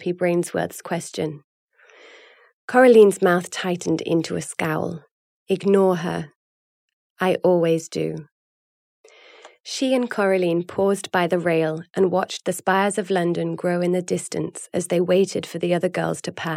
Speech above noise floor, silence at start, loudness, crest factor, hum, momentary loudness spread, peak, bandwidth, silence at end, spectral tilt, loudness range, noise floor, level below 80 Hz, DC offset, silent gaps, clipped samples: 29 dB; 0 s; -21 LUFS; 18 dB; none; 11 LU; -4 dBFS; 15.5 kHz; 0 s; -5.5 dB/octave; 5 LU; -50 dBFS; -70 dBFS; under 0.1%; 1.44-1.68 s, 2.53-2.68 s, 5.11-5.46 s, 6.35-7.16 s, 8.32-9.04 s, 9.60-9.64 s; under 0.1%